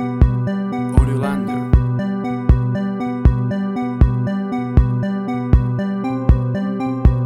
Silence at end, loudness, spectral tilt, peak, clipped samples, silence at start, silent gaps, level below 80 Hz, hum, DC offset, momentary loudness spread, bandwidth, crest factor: 0 s; -18 LUFS; -9.5 dB/octave; 0 dBFS; under 0.1%; 0 s; none; -20 dBFS; none; under 0.1%; 5 LU; 9.8 kHz; 16 dB